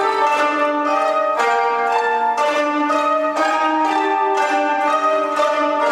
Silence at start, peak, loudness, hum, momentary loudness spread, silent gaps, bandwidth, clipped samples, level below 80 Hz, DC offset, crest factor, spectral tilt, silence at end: 0 s; -4 dBFS; -17 LUFS; none; 1 LU; none; 14 kHz; under 0.1%; -80 dBFS; under 0.1%; 12 dB; -2 dB/octave; 0 s